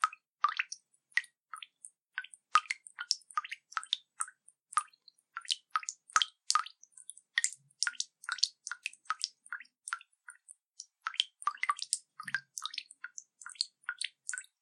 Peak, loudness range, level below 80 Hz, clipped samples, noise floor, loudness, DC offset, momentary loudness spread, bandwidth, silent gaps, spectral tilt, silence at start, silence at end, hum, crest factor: -6 dBFS; 4 LU; under -90 dBFS; under 0.1%; -65 dBFS; -36 LUFS; under 0.1%; 18 LU; 14 kHz; 0.28-0.33 s, 10.66-10.70 s; 5 dB/octave; 0 s; 0.2 s; none; 32 dB